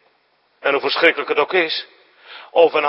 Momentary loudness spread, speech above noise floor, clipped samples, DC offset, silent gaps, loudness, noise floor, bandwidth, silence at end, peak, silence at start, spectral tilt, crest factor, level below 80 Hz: 9 LU; 45 dB; under 0.1%; under 0.1%; none; -18 LUFS; -61 dBFS; 5.8 kHz; 0 s; 0 dBFS; 0.65 s; -5 dB/octave; 20 dB; -76 dBFS